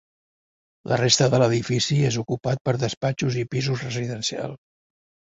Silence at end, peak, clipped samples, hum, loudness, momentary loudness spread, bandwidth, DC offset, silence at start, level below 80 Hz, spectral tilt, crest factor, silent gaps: 0.75 s; -6 dBFS; under 0.1%; none; -23 LUFS; 10 LU; 8 kHz; under 0.1%; 0.85 s; -56 dBFS; -4.5 dB/octave; 18 dB; 2.61-2.65 s, 2.97-3.01 s